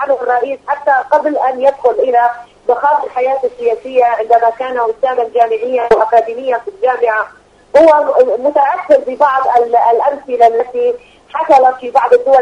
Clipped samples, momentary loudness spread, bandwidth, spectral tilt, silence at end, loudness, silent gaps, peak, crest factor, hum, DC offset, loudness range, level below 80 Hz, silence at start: 0.3%; 8 LU; 9.4 kHz; -4.5 dB/octave; 0 s; -12 LUFS; none; 0 dBFS; 12 dB; 50 Hz at -60 dBFS; under 0.1%; 2 LU; -52 dBFS; 0 s